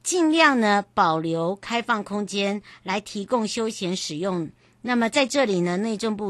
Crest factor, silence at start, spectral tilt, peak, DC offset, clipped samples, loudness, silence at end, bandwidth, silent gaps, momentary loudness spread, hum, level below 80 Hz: 20 dB; 0.05 s; -4 dB/octave; -4 dBFS; under 0.1%; under 0.1%; -23 LUFS; 0 s; 12.5 kHz; none; 11 LU; none; -64 dBFS